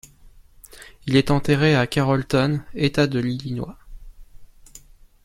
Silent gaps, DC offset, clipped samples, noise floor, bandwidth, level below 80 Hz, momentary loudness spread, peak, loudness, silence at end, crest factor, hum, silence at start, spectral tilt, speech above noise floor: none; under 0.1%; under 0.1%; -49 dBFS; 15 kHz; -44 dBFS; 17 LU; -4 dBFS; -21 LUFS; 0.45 s; 20 dB; none; 0.25 s; -6.5 dB/octave; 29 dB